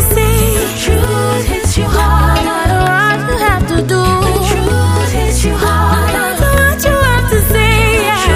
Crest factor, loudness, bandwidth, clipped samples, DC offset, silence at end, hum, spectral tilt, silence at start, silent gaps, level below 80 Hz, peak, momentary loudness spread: 10 dB; -11 LUFS; 15.5 kHz; under 0.1%; 0.4%; 0 s; none; -4.5 dB/octave; 0 s; none; -16 dBFS; 0 dBFS; 3 LU